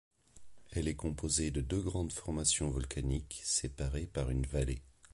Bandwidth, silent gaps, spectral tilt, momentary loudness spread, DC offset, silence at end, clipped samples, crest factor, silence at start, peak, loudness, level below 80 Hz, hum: 11.5 kHz; none; -4 dB/octave; 7 LU; under 0.1%; 0.25 s; under 0.1%; 20 dB; 0.35 s; -16 dBFS; -36 LUFS; -42 dBFS; none